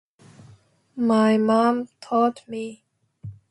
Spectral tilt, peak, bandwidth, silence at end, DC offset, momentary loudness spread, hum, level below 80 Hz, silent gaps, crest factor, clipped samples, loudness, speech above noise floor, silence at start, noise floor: -6.5 dB/octave; -6 dBFS; 11 kHz; 0.2 s; under 0.1%; 23 LU; none; -64 dBFS; none; 16 dB; under 0.1%; -22 LUFS; 33 dB; 0.95 s; -54 dBFS